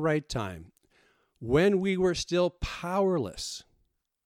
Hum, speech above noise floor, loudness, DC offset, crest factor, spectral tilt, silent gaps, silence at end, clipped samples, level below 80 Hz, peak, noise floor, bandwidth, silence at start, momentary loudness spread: none; 46 dB; -28 LUFS; under 0.1%; 16 dB; -5.5 dB/octave; none; 0.65 s; under 0.1%; -48 dBFS; -12 dBFS; -74 dBFS; 15 kHz; 0 s; 14 LU